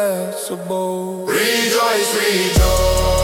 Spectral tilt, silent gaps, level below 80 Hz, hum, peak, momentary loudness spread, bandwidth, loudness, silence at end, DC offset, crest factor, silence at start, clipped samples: -3.5 dB/octave; none; -24 dBFS; none; -4 dBFS; 8 LU; 17.5 kHz; -17 LUFS; 0 s; under 0.1%; 14 dB; 0 s; under 0.1%